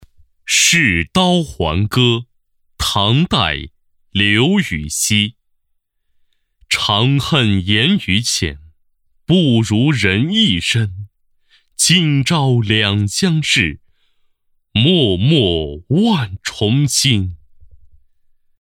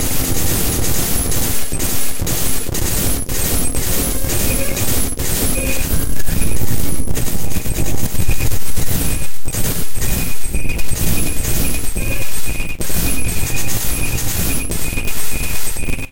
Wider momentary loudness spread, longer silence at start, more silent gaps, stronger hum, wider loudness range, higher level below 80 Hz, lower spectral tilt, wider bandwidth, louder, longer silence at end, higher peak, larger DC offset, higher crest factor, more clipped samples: first, 9 LU vs 5 LU; first, 0.45 s vs 0 s; neither; neither; about the same, 2 LU vs 3 LU; second, -40 dBFS vs -22 dBFS; about the same, -4 dB/octave vs -3.5 dB/octave; about the same, 17 kHz vs 17 kHz; first, -15 LUFS vs -19 LUFS; first, 0.95 s vs 0 s; about the same, -2 dBFS vs -4 dBFS; neither; first, 14 dB vs 8 dB; neither